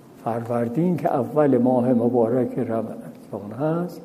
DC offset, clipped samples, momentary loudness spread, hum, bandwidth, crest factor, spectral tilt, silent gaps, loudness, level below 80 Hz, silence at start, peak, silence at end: under 0.1%; under 0.1%; 15 LU; none; 15 kHz; 14 dB; -9.5 dB/octave; none; -22 LUFS; -66 dBFS; 0.2 s; -8 dBFS; 0 s